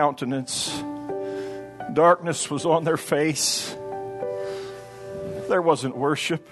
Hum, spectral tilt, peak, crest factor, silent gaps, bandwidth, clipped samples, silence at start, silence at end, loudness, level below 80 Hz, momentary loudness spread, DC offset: none; -3.5 dB/octave; -4 dBFS; 20 dB; none; 12.5 kHz; under 0.1%; 0 s; 0 s; -24 LUFS; -64 dBFS; 15 LU; under 0.1%